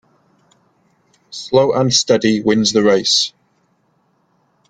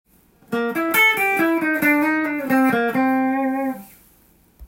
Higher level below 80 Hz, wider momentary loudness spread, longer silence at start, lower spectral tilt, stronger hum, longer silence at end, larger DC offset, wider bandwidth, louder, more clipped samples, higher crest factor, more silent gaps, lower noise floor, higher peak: about the same, -56 dBFS vs -58 dBFS; about the same, 8 LU vs 10 LU; first, 1.3 s vs 0.5 s; about the same, -3.5 dB/octave vs -4 dB/octave; neither; first, 1.4 s vs 0 s; neither; second, 9.6 kHz vs 17 kHz; first, -14 LUFS vs -19 LUFS; neither; about the same, 18 dB vs 14 dB; neither; first, -61 dBFS vs -55 dBFS; first, 0 dBFS vs -6 dBFS